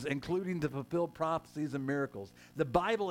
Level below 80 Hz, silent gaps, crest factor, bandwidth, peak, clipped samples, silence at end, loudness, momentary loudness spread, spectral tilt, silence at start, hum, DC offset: -60 dBFS; none; 22 dB; 16.5 kHz; -14 dBFS; under 0.1%; 0 s; -35 LUFS; 8 LU; -7 dB/octave; 0 s; none; under 0.1%